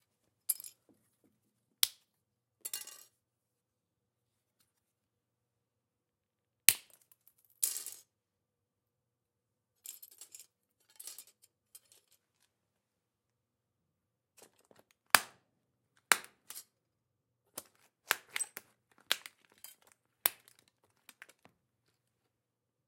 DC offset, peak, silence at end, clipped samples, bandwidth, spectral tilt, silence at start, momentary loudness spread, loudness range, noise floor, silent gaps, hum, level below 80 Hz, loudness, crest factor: under 0.1%; 0 dBFS; 2.55 s; under 0.1%; 16.5 kHz; 2 dB/octave; 0.5 s; 25 LU; 19 LU; -88 dBFS; none; none; under -90 dBFS; -33 LUFS; 42 dB